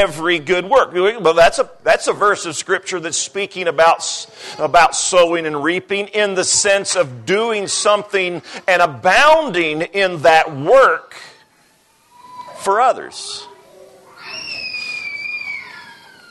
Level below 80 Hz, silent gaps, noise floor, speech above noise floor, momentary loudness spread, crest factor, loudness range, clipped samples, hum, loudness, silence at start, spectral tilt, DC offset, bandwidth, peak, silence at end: -50 dBFS; none; -55 dBFS; 39 dB; 14 LU; 14 dB; 9 LU; under 0.1%; none; -15 LUFS; 0 s; -2 dB/octave; under 0.1%; 12.5 kHz; -2 dBFS; 0.4 s